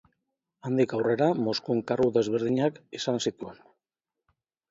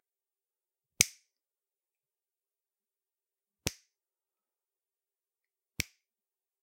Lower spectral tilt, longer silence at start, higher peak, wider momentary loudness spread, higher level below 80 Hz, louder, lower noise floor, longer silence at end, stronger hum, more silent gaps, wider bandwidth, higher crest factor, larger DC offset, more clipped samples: first, -6 dB/octave vs -0.5 dB/octave; second, 0.65 s vs 1 s; second, -12 dBFS vs 0 dBFS; about the same, 9 LU vs 10 LU; second, -68 dBFS vs -62 dBFS; first, -27 LUFS vs -33 LUFS; about the same, -89 dBFS vs under -90 dBFS; first, 1.15 s vs 0.8 s; neither; neither; second, 7.8 kHz vs 16 kHz; second, 18 dB vs 42 dB; neither; neither